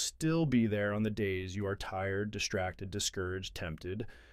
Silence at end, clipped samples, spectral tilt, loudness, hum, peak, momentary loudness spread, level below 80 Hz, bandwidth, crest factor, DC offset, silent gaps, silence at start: 0.05 s; under 0.1%; -4.5 dB/octave; -35 LUFS; none; -18 dBFS; 11 LU; -54 dBFS; 15.5 kHz; 18 dB; under 0.1%; none; 0 s